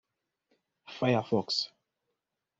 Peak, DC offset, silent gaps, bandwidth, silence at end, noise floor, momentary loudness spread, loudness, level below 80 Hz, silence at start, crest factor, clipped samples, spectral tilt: -14 dBFS; under 0.1%; none; 7.8 kHz; 0.95 s; -85 dBFS; 11 LU; -30 LUFS; -72 dBFS; 0.9 s; 20 dB; under 0.1%; -4 dB/octave